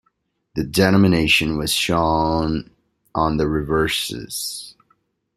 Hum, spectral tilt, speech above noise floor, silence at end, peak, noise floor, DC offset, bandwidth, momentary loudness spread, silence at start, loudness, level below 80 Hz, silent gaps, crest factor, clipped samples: none; -4.5 dB/octave; 50 dB; 0.65 s; -2 dBFS; -69 dBFS; under 0.1%; 16 kHz; 13 LU; 0.55 s; -19 LUFS; -40 dBFS; none; 18 dB; under 0.1%